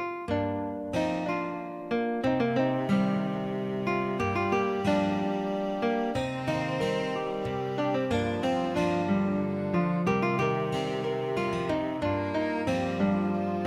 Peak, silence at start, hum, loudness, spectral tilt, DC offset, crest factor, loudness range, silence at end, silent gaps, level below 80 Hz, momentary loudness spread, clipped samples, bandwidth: -14 dBFS; 0 s; none; -29 LUFS; -7 dB/octave; under 0.1%; 14 dB; 1 LU; 0 s; none; -56 dBFS; 5 LU; under 0.1%; 12 kHz